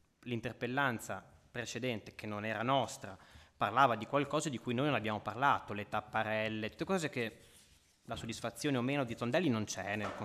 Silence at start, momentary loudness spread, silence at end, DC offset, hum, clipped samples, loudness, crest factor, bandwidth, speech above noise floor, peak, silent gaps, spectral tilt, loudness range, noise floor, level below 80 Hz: 0.25 s; 11 LU; 0 s; under 0.1%; none; under 0.1%; -36 LUFS; 22 dB; 15 kHz; 30 dB; -14 dBFS; none; -5 dB/octave; 4 LU; -66 dBFS; -66 dBFS